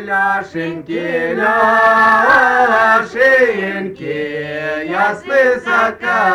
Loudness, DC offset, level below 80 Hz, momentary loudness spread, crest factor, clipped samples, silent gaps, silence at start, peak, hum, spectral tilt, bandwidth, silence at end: -13 LUFS; under 0.1%; -52 dBFS; 12 LU; 12 dB; under 0.1%; none; 0 s; -2 dBFS; none; -5 dB/octave; 13.5 kHz; 0 s